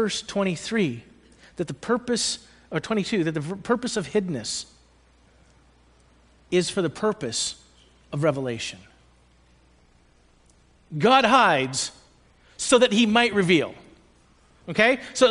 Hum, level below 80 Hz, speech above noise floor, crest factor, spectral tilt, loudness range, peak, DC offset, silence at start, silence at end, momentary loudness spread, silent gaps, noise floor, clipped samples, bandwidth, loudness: none; -58 dBFS; 36 dB; 22 dB; -4 dB/octave; 9 LU; -4 dBFS; under 0.1%; 0 s; 0 s; 15 LU; none; -58 dBFS; under 0.1%; 10.5 kHz; -23 LUFS